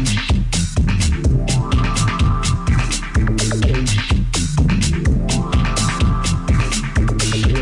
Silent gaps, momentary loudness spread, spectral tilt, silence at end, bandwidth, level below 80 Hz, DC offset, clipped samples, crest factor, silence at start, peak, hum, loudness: none; 2 LU; -4.5 dB/octave; 0 s; 11.5 kHz; -20 dBFS; under 0.1%; under 0.1%; 10 dB; 0 s; -6 dBFS; none; -18 LUFS